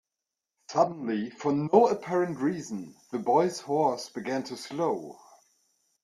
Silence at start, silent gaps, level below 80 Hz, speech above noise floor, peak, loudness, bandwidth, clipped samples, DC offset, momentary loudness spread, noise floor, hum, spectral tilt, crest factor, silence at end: 0.7 s; none; -72 dBFS; 60 dB; -6 dBFS; -28 LUFS; 13 kHz; under 0.1%; under 0.1%; 13 LU; -88 dBFS; none; -6 dB/octave; 22 dB; 0.9 s